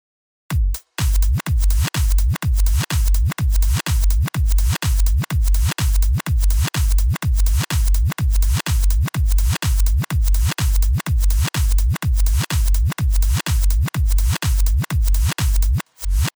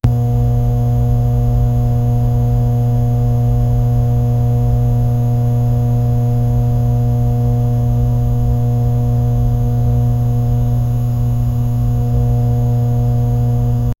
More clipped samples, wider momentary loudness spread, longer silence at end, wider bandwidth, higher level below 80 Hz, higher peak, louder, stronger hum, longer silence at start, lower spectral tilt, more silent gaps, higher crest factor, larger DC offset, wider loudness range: neither; about the same, 1 LU vs 1 LU; about the same, 0.1 s vs 0.05 s; first, over 20 kHz vs 12.5 kHz; about the same, -18 dBFS vs -22 dBFS; second, -8 dBFS vs 0 dBFS; second, -20 LUFS vs -15 LUFS; neither; first, 0.5 s vs 0.05 s; second, -4.5 dB/octave vs -10 dB/octave; neither; second, 8 dB vs 14 dB; neither; about the same, 0 LU vs 1 LU